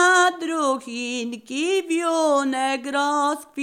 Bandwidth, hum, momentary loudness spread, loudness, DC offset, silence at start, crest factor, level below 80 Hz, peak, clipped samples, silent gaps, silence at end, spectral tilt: 16 kHz; none; 8 LU; -22 LUFS; under 0.1%; 0 s; 14 dB; -78 dBFS; -8 dBFS; under 0.1%; none; 0 s; -1 dB/octave